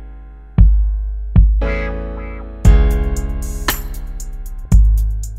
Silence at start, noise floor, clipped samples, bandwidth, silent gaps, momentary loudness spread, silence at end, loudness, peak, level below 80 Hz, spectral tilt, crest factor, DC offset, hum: 0 s; -34 dBFS; under 0.1%; 15.5 kHz; none; 17 LU; 0 s; -17 LUFS; 0 dBFS; -14 dBFS; -6 dB/octave; 14 dB; under 0.1%; none